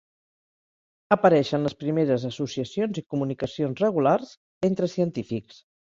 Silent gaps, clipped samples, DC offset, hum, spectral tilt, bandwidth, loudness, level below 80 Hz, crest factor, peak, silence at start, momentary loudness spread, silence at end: 4.37-4.61 s; under 0.1%; under 0.1%; none; -7 dB/octave; 7.8 kHz; -25 LUFS; -64 dBFS; 22 dB; -4 dBFS; 1.1 s; 10 LU; 0.55 s